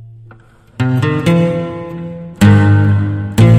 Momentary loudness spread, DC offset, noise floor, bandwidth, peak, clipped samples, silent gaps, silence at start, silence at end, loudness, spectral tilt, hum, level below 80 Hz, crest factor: 16 LU; under 0.1%; -42 dBFS; 13 kHz; 0 dBFS; 0.2%; none; 0 s; 0 s; -13 LUFS; -7.5 dB/octave; none; -36 dBFS; 12 dB